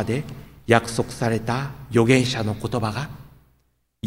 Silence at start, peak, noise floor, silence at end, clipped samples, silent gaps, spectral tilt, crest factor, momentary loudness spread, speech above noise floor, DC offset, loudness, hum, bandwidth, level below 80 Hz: 0 s; -2 dBFS; -66 dBFS; 0 s; under 0.1%; none; -5.5 dB/octave; 22 dB; 14 LU; 45 dB; under 0.1%; -22 LUFS; none; 16 kHz; -48 dBFS